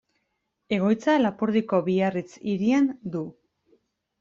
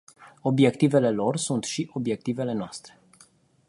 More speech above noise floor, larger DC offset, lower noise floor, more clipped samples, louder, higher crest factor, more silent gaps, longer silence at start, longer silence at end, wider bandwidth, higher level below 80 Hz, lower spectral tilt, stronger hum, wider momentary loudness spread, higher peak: first, 53 dB vs 34 dB; neither; first, -77 dBFS vs -58 dBFS; neither; about the same, -24 LUFS vs -25 LUFS; about the same, 16 dB vs 20 dB; neither; first, 0.7 s vs 0.2 s; about the same, 0.9 s vs 0.8 s; second, 7.6 kHz vs 11.5 kHz; about the same, -66 dBFS vs -66 dBFS; first, -7 dB/octave vs -5.5 dB/octave; neither; about the same, 11 LU vs 11 LU; second, -10 dBFS vs -6 dBFS